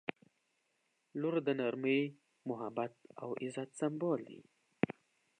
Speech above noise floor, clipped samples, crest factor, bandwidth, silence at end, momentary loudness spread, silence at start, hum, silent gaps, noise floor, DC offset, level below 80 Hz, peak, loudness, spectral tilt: 43 dB; under 0.1%; 24 dB; 10.5 kHz; 0.5 s; 14 LU; 0.1 s; none; none; -80 dBFS; under 0.1%; -82 dBFS; -14 dBFS; -38 LUFS; -6.5 dB/octave